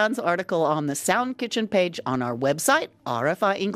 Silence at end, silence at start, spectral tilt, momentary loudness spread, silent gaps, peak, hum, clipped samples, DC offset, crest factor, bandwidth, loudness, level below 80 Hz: 0 s; 0 s; -4 dB/octave; 5 LU; none; -6 dBFS; none; under 0.1%; under 0.1%; 16 dB; 15.5 kHz; -24 LUFS; -68 dBFS